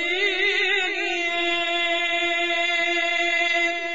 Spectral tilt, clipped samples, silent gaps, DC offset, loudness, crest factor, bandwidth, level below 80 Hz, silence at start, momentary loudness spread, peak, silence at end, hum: -0.5 dB/octave; under 0.1%; none; 0.7%; -21 LUFS; 12 dB; 8 kHz; -60 dBFS; 0 s; 2 LU; -10 dBFS; 0 s; none